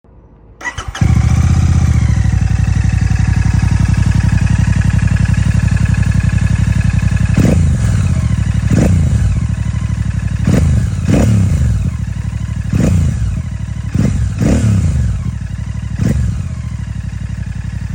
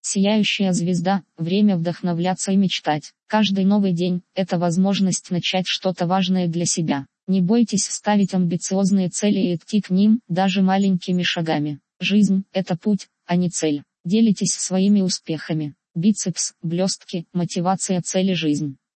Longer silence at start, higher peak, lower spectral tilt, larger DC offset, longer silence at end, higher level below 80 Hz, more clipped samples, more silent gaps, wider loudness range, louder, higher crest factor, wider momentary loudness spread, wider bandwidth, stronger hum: first, 0.6 s vs 0.05 s; first, 0 dBFS vs -6 dBFS; first, -7 dB/octave vs -5 dB/octave; neither; second, 0 s vs 0.2 s; first, -18 dBFS vs -68 dBFS; neither; second, none vs 7.23-7.27 s, 14.00-14.04 s; about the same, 3 LU vs 2 LU; first, -14 LUFS vs -21 LUFS; about the same, 12 dB vs 14 dB; first, 10 LU vs 7 LU; first, 16 kHz vs 8.8 kHz; neither